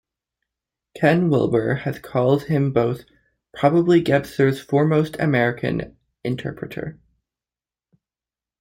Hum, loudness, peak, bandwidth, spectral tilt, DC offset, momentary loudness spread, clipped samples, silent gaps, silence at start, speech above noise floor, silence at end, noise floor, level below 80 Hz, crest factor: none; -20 LUFS; -4 dBFS; 16.5 kHz; -8 dB/octave; under 0.1%; 14 LU; under 0.1%; none; 0.95 s; over 71 dB; 1.7 s; under -90 dBFS; -54 dBFS; 18 dB